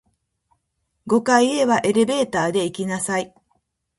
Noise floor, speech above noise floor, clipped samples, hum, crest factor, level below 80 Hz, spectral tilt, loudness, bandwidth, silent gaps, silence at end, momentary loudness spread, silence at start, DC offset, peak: -74 dBFS; 55 dB; under 0.1%; none; 20 dB; -62 dBFS; -4 dB/octave; -20 LUFS; 11.5 kHz; none; 0.7 s; 8 LU; 1.05 s; under 0.1%; -2 dBFS